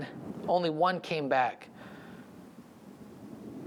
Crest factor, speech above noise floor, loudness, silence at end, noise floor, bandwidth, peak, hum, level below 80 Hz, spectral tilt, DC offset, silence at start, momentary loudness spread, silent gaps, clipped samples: 20 dB; 22 dB; -30 LUFS; 0 s; -51 dBFS; 16.5 kHz; -14 dBFS; none; -74 dBFS; -6 dB/octave; under 0.1%; 0 s; 23 LU; none; under 0.1%